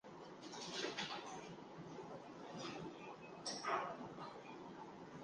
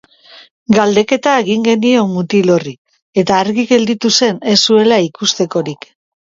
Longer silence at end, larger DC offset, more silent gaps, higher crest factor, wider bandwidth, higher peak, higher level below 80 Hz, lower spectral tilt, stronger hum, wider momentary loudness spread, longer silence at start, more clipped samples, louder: second, 0 s vs 0.55 s; neither; second, none vs 2.78-2.85 s, 3.02-3.13 s; first, 22 dB vs 14 dB; first, 10 kHz vs 7.8 kHz; second, -28 dBFS vs 0 dBFS; second, -82 dBFS vs -56 dBFS; about the same, -3.5 dB/octave vs -4 dB/octave; neither; first, 12 LU vs 9 LU; second, 0.05 s vs 0.7 s; neither; second, -49 LUFS vs -12 LUFS